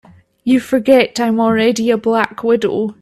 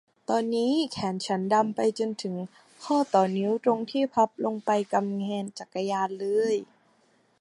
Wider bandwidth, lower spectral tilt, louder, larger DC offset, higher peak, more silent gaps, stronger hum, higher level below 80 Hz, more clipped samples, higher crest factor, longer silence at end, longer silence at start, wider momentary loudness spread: first, 14 kHz vs 11.5 kHz; about the same, -5 dB/octave vs -5.5 dB/octave; first, -14 LUFS vs -27 LUFS; neither; first, 0 dBFS vs -8 dBFS; neither; neither; first, -56 dBFS vs -74 dBFS; neither; about the same, 14 dB vs 18 dB; second, 0.1 s vs 0.75 s; first, 0.45 s vs 0.3 s; second, 4 LU vs 9 LU